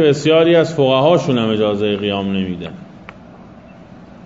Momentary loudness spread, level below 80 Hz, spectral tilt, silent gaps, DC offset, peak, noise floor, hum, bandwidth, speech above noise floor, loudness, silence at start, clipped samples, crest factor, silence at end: 14 LU; -52 dBFS; -6.5 dB/octave; none; under 0.1%; 0 dBFS; -39 dBFS; none; 7.8 kHz; 25 dB; -15 LUFS; 0 s; under 0.1%; 16 dB; 0.2 s